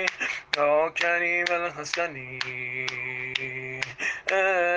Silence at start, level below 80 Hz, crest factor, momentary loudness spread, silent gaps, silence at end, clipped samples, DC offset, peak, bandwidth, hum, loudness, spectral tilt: 0 s; -64 dBFS; 24 dB; 9 LU; none; 0 s; under 0.1%; under 0.1%; -4 dBFS; 9.8 kHz; none; -26 LUFS; -3 dB/octave